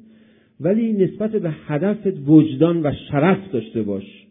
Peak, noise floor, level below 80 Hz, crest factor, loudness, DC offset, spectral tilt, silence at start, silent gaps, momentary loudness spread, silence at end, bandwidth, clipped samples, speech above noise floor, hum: -2 dBFS; -52 dBFS; -54 dBFS; 18 dB; -19 LUFS; under 0.1%; -12.5 dB/octave; 0.6 s; none; 11 LU; 0.2 s; 3.8 kHz; under 0.1%; 33 dB; none